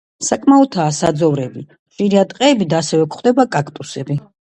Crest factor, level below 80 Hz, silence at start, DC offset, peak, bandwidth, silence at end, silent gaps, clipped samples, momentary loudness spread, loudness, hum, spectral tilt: 16 dB; -56 dBFS; 0.2 s; under 0.1%; 0 dBFS; 11 kHz; 0.3 s; 1.79-1.86 s; under 0.1%; 12 LU; -15 LUFS; none; -5.5 dB/octave